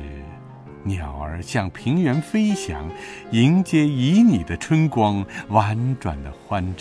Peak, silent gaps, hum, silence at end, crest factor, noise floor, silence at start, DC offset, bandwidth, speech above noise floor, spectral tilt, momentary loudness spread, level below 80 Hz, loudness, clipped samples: -2 dBFS; none; none; 0 s; 18 dB; -40 dBFS; 0 s; under 0.1%; 11 kHz; 20 dB; -7 dB/octave; 17 LU; -40 dBFS; -21 LUFS; under 0.1%